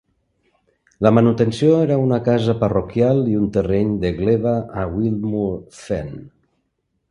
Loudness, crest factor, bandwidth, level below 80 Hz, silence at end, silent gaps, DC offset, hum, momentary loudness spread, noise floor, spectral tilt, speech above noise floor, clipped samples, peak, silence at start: -18 LUFS; 18 dB; 11 kHz; -42 dBFS; 0.85 s; none; under 0.1%; none; 11 LU; -71 dBFS; -8.5 dB/octave; 54 dB; under 0.1%; 0 dBFS; 1 s